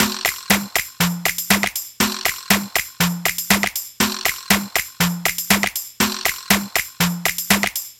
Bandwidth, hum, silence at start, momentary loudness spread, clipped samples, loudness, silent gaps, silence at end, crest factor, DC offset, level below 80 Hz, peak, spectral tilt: 17.5 kHz; none; 0 s; 5 LU; under 0.1%; -19 LUFS; none; 0.05 s; 20 dB; under 0.1%; -46 dBFS; 0 dBFS; -2.5 dB/octave